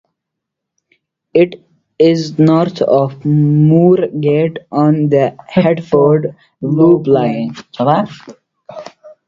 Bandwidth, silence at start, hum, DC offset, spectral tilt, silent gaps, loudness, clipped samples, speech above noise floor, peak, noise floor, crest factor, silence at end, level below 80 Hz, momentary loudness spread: 7.4 kHz; 1.35 s; none; under 0.1%; -9 dB/octave; none; -12 LUFS; under 0.1%; 66 dB; 0 dBFS; -78 dBFS; 14 dB; 0.2 s; -52 dBFS; 11 LU